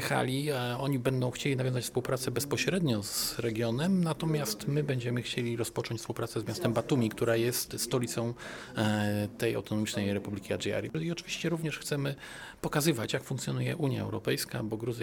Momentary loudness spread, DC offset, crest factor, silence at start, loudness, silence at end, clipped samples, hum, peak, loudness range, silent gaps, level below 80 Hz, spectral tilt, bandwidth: 6 LU; under 0.1%; 18 dB; 0 s; -32 LUFS; 0 s; under 0.1%; none; -14 dBFS; 2 LU; none; -60 dBFS; -5 dB/octave; 19 kHz